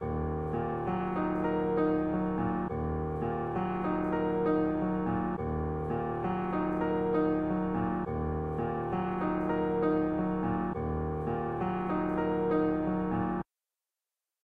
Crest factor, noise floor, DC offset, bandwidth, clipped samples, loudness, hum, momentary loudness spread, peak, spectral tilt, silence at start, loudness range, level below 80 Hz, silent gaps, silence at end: 14 dB; under -90 dBFS; 0.1%; 4.7 kHz; under 0.1%; -31 LUFS; none; 5 LU; -16 dBFS; -10.5 dB/octave; 0 s; 1 LU; -46 dBFS; none; 1 s